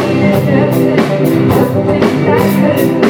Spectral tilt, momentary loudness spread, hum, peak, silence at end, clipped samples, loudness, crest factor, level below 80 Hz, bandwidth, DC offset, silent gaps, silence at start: -7.5 dB/octave; 1 LU; none; 0 dBFS; 0 s; under 0.1%; -11 LUFS; 10 dB; -40 dBFS; 20 kHz; under 0.1%; none; 0 s